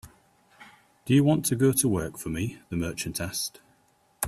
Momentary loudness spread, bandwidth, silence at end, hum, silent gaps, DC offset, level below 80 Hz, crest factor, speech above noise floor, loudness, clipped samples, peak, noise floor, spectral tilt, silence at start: 11 LU; 16 kHz; 0 s; none; none; under 0.1%; -54 dBFS; 18 dB; 39 dB; -26 LUFS; under 0.1%; -10 dBFS; -65 dBFS; -5 dB/octave; 0.05 s